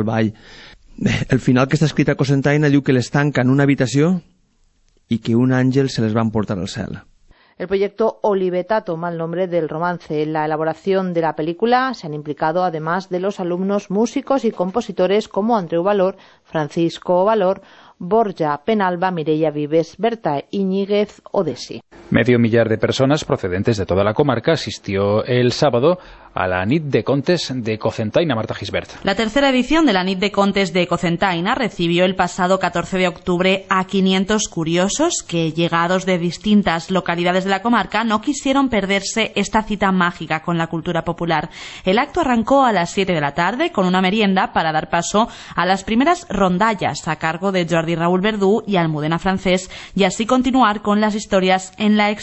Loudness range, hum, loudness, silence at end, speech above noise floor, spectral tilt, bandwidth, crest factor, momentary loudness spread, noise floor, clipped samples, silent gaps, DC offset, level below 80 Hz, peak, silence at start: 3 LU; none; -18 LUFS; 0 s; 41 dB; -5.5 dB/octave; 8.4 kHz; 16 dB; 7 LU; -58 dBFS; under 0.1%; none; under 0.1%; -46 dBFS; -2 dBFS; 0 s